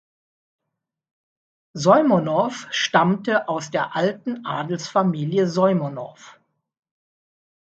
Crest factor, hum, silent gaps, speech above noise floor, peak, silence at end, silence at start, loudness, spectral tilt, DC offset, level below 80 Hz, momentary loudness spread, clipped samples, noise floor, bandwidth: 20 dB; none; none; 61 dB; -2 dBFS; 1.3 s; 1.75 s; -21 LUFS; -5.5 dB/octave; under 0.1%; -70 dBFS; 12 LU; under 0.1%; -82 dBFS; 8 kHz